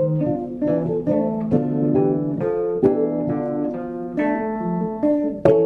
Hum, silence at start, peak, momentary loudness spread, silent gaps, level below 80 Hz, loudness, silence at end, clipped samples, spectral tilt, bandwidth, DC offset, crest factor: none; 0 s; -4 dBFS; 5 LU; none; -50 dBFS; -21 LUFS; 0 s; under 0.1%; -11 dB/octave; 4.7 kHz; under 0.1%; 16 dB